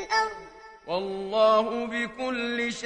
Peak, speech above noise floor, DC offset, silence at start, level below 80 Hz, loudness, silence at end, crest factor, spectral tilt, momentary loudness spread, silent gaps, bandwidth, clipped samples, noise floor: -10 dBFS; 20 dB; under 0.1%; 0 s; -60 dBFS; -26 LUFS; 0 s; 18 dB; -3.5 dB/octave; 17 LU; none; 10 kHz; under 0.1%; -46 dBFS